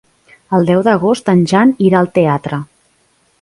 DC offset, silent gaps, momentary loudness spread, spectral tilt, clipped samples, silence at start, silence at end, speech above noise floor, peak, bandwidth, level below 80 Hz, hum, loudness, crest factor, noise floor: under 0.1%; none; 8 LU; -7.5 dB/octave; under 0.1%; 0.5 s; 0.75 s; 45 dB; 0 dBFS; 11.5 kHz; -52 dBFS; none; -12 LUFS; 14 dB; -57 dBFS